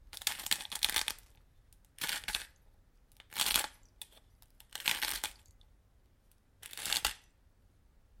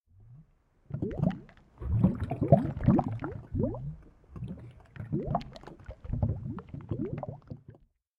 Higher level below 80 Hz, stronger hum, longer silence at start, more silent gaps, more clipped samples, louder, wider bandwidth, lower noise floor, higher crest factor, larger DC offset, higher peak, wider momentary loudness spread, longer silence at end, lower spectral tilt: second, -60 dBFS vs -46 dBFS; neither; second, 0 s vs 0.2 s; neither; neither; about the same, -34 LUFS vs -32 LUFS; first, 17 kHz vs 5.4 kHz; first, -67 dBFS vs -63 dBFS; first, 32 dB vs 26 dB; neither; about the same, -8 dBFS vs -8 dBFS; about the same, 21 LU vs 22 LU; first, 1 s vs 0.45 s; second, 1 dB/octave vs -11 dB/octave